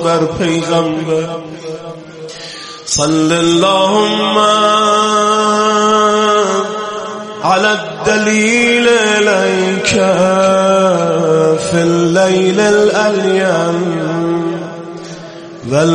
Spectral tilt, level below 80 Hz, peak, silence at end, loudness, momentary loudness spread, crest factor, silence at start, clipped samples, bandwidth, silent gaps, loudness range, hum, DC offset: -4 dB/octave; -48 dBFS; 0 dBFS; 0 s; -12 LUFS; 16 LU; 12 dB; 0 s; under 0.1%; 11.5 kHz; none; 4 LU; none; under 0.1%